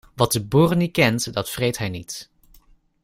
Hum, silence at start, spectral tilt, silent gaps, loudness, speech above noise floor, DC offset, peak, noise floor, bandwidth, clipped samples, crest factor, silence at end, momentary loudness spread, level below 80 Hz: none; 0.15 s; -5 dB/octave; none; -21 LUFS; 33 dB; under 0.1%; -2 dBFS; -54 dBFS; 16 kHz; under 0.1%; 20 dB; 0.8 s; 14 LU; -50 dBFS